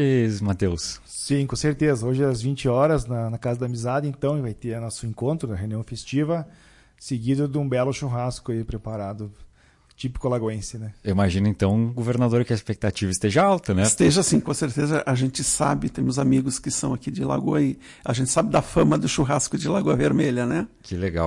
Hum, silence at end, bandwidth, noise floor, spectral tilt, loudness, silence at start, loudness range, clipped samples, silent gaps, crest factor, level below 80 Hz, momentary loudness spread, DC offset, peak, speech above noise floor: none; 0 s; 11.5 kHz; -57 dBFS; -5.5 dB/octave; -23 LUFS; 0 s; 7 LU; under 0.1%; none; 16 dB; -46 dBFS; 11 LU; under 0.1%; -8 dBFS; 34 dB